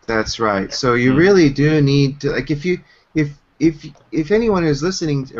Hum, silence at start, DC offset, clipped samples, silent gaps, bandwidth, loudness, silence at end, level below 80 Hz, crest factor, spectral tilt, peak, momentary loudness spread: none; 0.1 s; under 0.1%; under 0.1%; none; 7.6 kHz; -17 LUFS; 0 s; -40 dBFS; 14 dB; -6 dB/octave; -2 dBFS; 12 LU